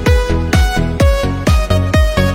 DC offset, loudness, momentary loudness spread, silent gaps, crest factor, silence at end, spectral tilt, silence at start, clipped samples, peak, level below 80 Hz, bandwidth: under 0.1%; -14 LUFS; 2 LU; none; 12 dB; 0 s; -6 dB/octave; 0 s; under 0.1%; 0 dBFS; -16 dBFS; 16.5 kHz